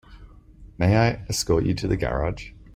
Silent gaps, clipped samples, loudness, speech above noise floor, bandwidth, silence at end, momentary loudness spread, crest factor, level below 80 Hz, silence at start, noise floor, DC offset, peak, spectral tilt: none; under 0.1%; -23 LUFS; 25 dB; 16 kHz; 0.05 s; 8 LU; 18 dB; -38 dBFS; 0.1 s; -47 dBFS; under 0.1%; -6 dBFS; -5.5 dB/octave